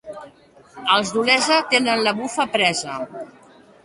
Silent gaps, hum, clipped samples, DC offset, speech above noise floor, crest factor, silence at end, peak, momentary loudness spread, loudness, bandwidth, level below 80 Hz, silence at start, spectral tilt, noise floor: none; none; under 0.1%; under 0.1%; 29 dB; 20 dB; 0.55 s; 0 dBFS; 21 LU; -18 LUFS; 11.5 kHz; -64 dBFS; 0.05 s; -2 dB/octave; -49 dBFS